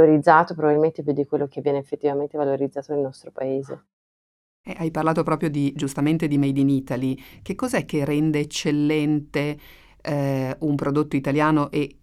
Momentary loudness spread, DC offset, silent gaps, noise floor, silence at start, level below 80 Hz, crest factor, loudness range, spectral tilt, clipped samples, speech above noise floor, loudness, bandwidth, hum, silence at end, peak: 9 LU; under 0.1%; 3.93-4.64 s; under -90 dBFS; 0 s; -54 dBFS; 20 dB; 4 LU; -7 dB/octave; under 0.1%; over 68 dB; -23 LUFS; 13.5 kHz; none; 0.1 s; -2 dBFS